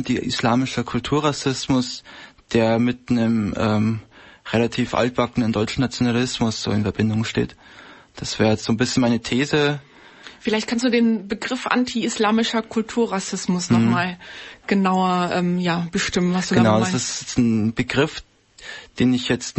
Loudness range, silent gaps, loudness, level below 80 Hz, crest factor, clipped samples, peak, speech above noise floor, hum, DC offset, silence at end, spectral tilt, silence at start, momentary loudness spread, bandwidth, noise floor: 2 LU; none; -21 LUFS; -48 dBFS; 16 dB; under 0.1%; -4 dBFS; 23 dB; none; under 0.1%; 0.1 s; -5 dB/octave; 0 s; 9 LU; 8.6 kHz; -44 dBFS